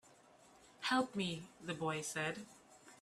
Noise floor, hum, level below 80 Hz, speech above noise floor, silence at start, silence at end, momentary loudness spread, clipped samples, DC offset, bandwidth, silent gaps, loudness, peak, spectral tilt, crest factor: -65 dBFS; none; -78 dBFS; 25 dB; 0.05 s; 0.05 s; 21 LU; under 0.1%; under 0.1%; 15 kHz; none; -40 LUFS; -22 dBFS; -4 dB/octave; 20 dB